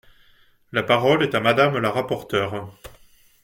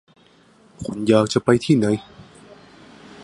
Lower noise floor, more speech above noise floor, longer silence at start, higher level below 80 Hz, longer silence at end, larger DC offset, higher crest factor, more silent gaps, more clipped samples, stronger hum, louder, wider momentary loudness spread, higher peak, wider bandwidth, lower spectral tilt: about the same, -56 dBFS vs -53 dBFS; about the same, 36 dB vs 35 dB; about the same, 0.75 s vs 0.8 s; about the same, -56 dBFS vs -54 dBFS; first, 0.55 s vs 0 s; neither; about the same, 18 dB vs 20 dB; neither; neither; neither; about the same, -21 LUFS vs -19 LUFS; about the same, 11 LU vs 13 LU; about the same, -4 dBFS vs -2 dBFS; first, 17 kHz vs 11.5 kHz; about the same, -6 dB/octave vs -6 dB/octave